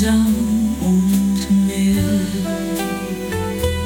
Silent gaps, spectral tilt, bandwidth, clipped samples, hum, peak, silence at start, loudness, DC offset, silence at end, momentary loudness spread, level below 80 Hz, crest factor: none; -6 dB/octave; 18 kHz; under 0.1%; none; -4 dBFS; 0 s; -18 LUFS; under 0.1%; 0 s; 7 LU; -34 dBFS; 12 dB